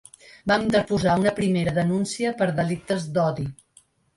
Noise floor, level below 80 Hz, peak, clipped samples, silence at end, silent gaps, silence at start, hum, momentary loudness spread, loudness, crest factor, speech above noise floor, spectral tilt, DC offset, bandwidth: -59 dBFS; -52 dBFS; -6 dBFS; under 0.1%; 0.65 s; none; 0.45 s; none; 6 LU; -23 LUFS; 18 dB; 36 dB; -6 dB/octave; under 0.1%; 11.5 kHz